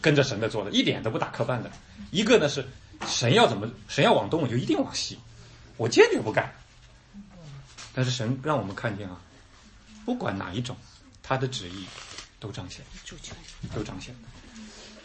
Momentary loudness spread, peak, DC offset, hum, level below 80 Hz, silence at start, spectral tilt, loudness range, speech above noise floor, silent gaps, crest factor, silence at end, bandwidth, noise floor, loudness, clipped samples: 23 LU; -4 dBFS; under 0.1%; none; -54 dBFS; 0 s; -4.5 dB/octave; 11 LU; 27 dB; none; 24 dB; 0.05 s; 8.8 kHz; -53 dBFS; -26 LUFS; under 0.1%